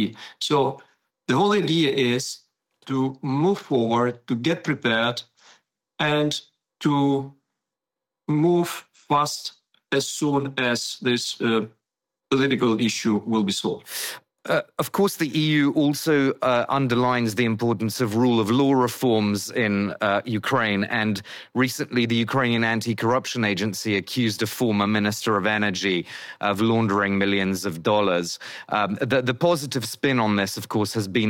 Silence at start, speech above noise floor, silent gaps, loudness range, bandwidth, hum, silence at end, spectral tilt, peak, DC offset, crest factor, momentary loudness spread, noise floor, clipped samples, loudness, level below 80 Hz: 0 s; 65 dB; none; 3 LU; 17.5 kHz; none; 0 s; -5 dB/octave; -10 dBFS; under 0.1%; 14 dB; 7 LU; -87 dBFS; under 0.1%; -23 LUFS; -66 dBFS